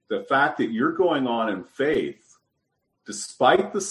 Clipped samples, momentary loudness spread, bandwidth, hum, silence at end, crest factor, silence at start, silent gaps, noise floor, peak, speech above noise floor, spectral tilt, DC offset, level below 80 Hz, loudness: under 0.1%; 14 LU; 12 kHz; none; 0 s; 18 dB; 0.1 s; none; -76 dBFS; -6 dBFS; 53 dB; -4 dB/octave; under 0.1%; -64 dBFS; -23 LUFS